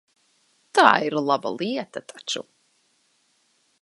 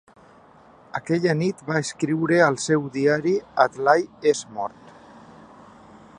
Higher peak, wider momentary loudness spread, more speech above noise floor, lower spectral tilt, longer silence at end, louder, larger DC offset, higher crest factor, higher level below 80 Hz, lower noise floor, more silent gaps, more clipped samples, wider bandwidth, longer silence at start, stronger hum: about the same, 0 dBFS vs -2 dBFS; about the same, 15 LU vs 13 LU; first, 44 dB vs 29 dB; second, -3.5 dB/octave vs -5.5 dB/octave; about the same, 1.4 s vs 1.5 s; about the same, -22 LUFS vs -22 LUFS; neither; first, 26 dB vs 20 dB; second, -76 dBFS vs -66 dBFS; first, -67 dBFS vs -51 dBFS; neither; neither; about the same, 11.5 kHz vs 11 kHz; second, 0.75 s vs 0.95 s; neither